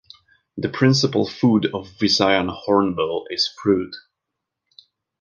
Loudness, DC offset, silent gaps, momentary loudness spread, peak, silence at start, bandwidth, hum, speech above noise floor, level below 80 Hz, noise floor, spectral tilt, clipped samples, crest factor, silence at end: -20 LUFS; under 0.1%; none; 11 LU; -2 dBFS; 0.55 s; 10 kHz; none; 62 dB; -54 dBFS; -82 dBFS; -5 dB/octave; under 0.1%; 20 dB; 1.2 s